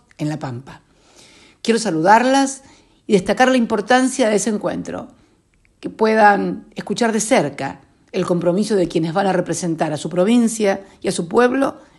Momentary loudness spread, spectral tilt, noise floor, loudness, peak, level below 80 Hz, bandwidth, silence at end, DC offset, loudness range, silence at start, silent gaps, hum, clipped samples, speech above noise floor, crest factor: 15 LU; -4.5 dB/octave; -58 dBFS; -17 LUFS; 0 dBFS; -56 dBFS; 12.5 kHz; 0.2 s; under 0.1%; 3 LU; 0.2 s; none; none; under 0.1%; 40 dB; 18 dB